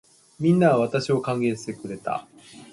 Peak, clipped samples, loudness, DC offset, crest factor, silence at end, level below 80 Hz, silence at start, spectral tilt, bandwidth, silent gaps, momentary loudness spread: -6 dBFS; under 0.1%; -24 LUFS; under 0.1%; 18 dB; 0.1 s; -64 dBFS; 0.4 s; -7 dB/octave; 11.5 kHz; none; 14 LU